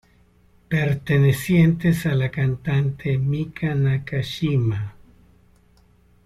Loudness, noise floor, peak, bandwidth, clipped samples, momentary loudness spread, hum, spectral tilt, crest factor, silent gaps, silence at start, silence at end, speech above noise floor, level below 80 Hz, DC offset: -21 LUFS; -56 dBFS; -6 dBFS; 14.5 kHz; under 0.1%; 8 LU; none; -7.5 dB/octave; 16 dB; none; 0.7 s; 1.35 s; 36 dB; -48 dBFS; under 0.1%